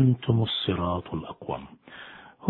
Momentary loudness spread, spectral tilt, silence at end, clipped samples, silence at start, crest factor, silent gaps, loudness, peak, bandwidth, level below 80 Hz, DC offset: 20 LU; -10 dB/octave; 0 s; under 0.1%; 0 s; 22 dB; none; -28 LUFS; -4 dBFS; 4.3 kHz; -52 dBFS; under 0.1%